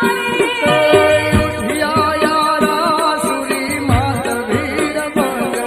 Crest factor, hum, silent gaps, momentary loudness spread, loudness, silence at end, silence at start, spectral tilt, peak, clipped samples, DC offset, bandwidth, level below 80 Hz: 14 dB; none; none; 7 LU; -15 LUFS; 0 s; 0 s; -4.5 dB/octave; 0 dBFS; under 0.1%; under 0.1%; 15.5 kHz; -36 dBFS